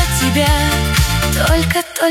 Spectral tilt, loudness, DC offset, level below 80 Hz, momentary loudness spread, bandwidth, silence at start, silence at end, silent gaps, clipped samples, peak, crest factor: -4 dB/octave; -14 LUFS; under 0.1%; -20 dBFS; 2 LU; 16.5 kHz; 0 s; 0 s; none; under 0.1%; 0 dBFS; 14 dB